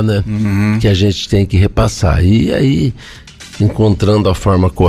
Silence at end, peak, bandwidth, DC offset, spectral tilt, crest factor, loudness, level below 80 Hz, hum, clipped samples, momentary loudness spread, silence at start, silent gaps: 0 s; -2 dBFS; 12.5 kHz; under 0.1%; -7 dB/octave; 10 dB; -13 LUFS; -26 dBFS; none; under 0.1%; 5 LU; 0 s; none